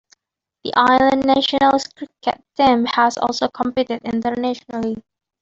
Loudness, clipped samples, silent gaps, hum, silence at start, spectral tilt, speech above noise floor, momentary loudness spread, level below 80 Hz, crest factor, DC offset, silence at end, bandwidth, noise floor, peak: -18 LUFS; under 0.1%; none; none; 0.65 s; -4 dB/octave; 62 dB; 11 LU; -54 dBFS; 16 dB; under 0.1%; 0.4 s; 7.8 kHz; -80 dBFS; -2 dBFS